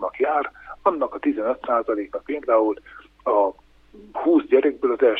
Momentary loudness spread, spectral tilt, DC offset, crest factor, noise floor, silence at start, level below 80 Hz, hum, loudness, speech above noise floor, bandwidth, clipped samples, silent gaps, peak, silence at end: 10 LU; -7 dB/octave; under 0.1%; 18 dB; -48 dBFS; 0 s; -58 dBFS; none; -22 LUFS; 27 dB; 4.5 kHz; under 0.1%; none; -4 dBFS; 0 s